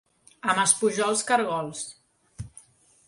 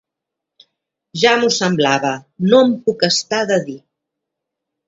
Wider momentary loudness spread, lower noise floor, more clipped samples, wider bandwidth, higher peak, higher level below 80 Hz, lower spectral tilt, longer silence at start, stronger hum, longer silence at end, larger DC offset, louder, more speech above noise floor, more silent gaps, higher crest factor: first, 22 LU vs 11 LU; second, -54 dBFS vs -82 dBFS; neither; first, 11.5 kHz vs 7.8 kHz; second, -4 dBFS vs 0 dBFS; about the same, -58 dBFS vs -62 dBFS; second, -2 dB/octave vs -4 dB/octave; second, 0.45 s vs 1.15 s; neither; second, 0.6 s vs 1.1 s; neither; second, -24 LUFS vs -15 LUFS; second, 30 dB vs 67 dB; neither; about the same, 22 dB vs 18 dB